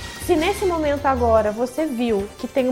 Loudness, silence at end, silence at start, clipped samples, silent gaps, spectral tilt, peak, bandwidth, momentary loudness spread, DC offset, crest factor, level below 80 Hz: -21 LUFS; 0 s; 0 s; under 0.1%; none; -5.5 dB/octave; -4 dBFS; 17 kHz; 6 LU; under 0.1%; 16 dB; -38 dBFS